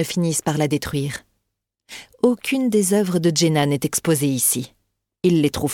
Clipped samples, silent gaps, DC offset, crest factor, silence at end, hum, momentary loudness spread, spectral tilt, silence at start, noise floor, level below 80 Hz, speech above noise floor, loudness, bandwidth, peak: under 0.1%; none; under 0.1%; 16 dB; 0 s; none; 13 LU; -4.5 dB/octave; 0 s; -78 dBFS; -52 dBFS; 58 dB; -20 LUFS; 18.5 kHz; -4 dBFS